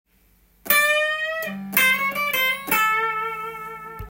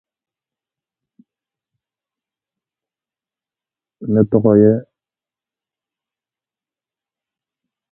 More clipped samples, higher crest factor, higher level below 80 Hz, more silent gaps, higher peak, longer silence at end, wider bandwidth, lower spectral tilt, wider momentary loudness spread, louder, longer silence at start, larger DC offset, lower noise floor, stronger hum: neither; about the same, 22 dB vs 22 dB; about the same, -54 dBFS vs -56 dBFS; neither; about the same, -2 dBFS vs 0 dBFS; second, 0 s vs 3.1 s; first, 17.5 kHz vs 2 kHz; second, -1.5 dB/octave vs -14.5 dB/octave; about the same, 13 LU vs 11 LU; second, -20 LUFS vs -14 LUFS; second, 0.65 s vs 4 s; neither; second, -59 dBFS vs under -90 dBFS; neither